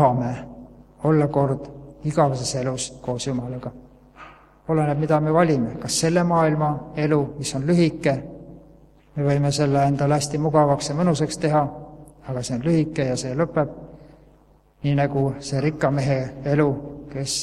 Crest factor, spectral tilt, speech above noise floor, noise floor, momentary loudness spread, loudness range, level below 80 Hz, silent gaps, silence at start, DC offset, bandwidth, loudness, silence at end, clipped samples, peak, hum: 20 dB; -6 dB/octave; 34 dB; -55 dBFS; 13 LU; 4 LU; -50 dBFS; none; 0 s; under 0.1%; 13 kHz; -22 LUFS; 0 s; under 0.1%; -4 dBFS; none